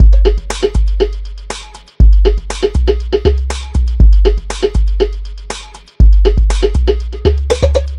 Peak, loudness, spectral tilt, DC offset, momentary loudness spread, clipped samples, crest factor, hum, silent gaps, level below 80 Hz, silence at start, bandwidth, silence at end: 0 dBFS; -13 LUFS; -6.5 dB/octave; 0.2%; 16 LU; 0.7%; 10 dB; none; none; -12 dBFS; 0 s; 10.5 kHz; 0 s